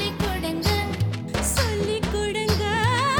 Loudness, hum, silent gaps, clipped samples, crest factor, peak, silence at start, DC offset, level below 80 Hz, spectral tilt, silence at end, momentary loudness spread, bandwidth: -24 LUFS; none; none; under 0.1%; 16 dB; -6 dBFS; 0 s; 0.2%; -34 dBFS; -4.5 dB/octave; 0 s; 4 LU; 19.5 kHz